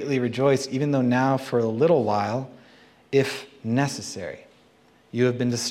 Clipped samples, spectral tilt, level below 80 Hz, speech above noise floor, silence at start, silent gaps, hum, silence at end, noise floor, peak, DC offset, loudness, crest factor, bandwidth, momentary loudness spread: under 0.1%; -5.5 dB/octave; -68 dBFS; 35 dB; 0 s; none; none; 0 s; -57 dBFS; -8 dBFS; under 0.1%; -24 LUFS; 16 dB; 14.5 kHz; 13 LU